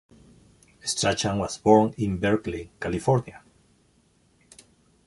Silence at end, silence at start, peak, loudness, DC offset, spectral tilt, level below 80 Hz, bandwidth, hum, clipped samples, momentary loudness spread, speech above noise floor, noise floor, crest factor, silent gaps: 1.7 s; 0.85 s; -4 dBFS; -24 LUFS; under 0.1%; -5 dB/octave; -50 dBFS; 11.5 kHz; none; under 0.1%; 14 LU; 39 dB; -63 dBFS; 24 dB; none